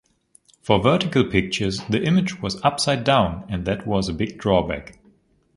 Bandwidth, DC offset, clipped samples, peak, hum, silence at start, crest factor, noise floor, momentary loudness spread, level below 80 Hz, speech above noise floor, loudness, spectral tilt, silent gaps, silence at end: 11.5 kHz; under 0.1%; under 0.1%; 0 dBFS; none; 0.65 s; 22 dB; -58 dBFS; 8 LU; -42 dBFS; 38 dB; -21 LUFS; -5.5 dB/octave; none; 0.65 s